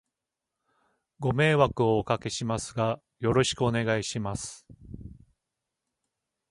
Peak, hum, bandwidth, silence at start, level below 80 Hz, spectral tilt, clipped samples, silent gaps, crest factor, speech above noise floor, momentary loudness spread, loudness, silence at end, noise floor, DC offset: -6 dBFS; none; 11.5 kHz; 1.2 s; -52 dBFS; -5 dB/octave; under 0.1%; none; 22 dB; 60 dB; 17 LU; -27 LUFS; 1.4 s; -87 dBFS; under 0.1%